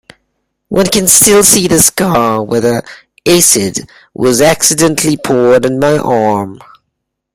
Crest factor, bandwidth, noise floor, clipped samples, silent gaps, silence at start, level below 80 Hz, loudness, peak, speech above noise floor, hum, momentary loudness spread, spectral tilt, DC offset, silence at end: 10 dB; over 20 kHz; -71 dBFS; 0.4%; none; 0.7 s; -42 dBFS; -9 LUFS; 0 dBFS; 61 dB; none; 12 LU; -3 dB/octave; under 0.1%; 0.8 s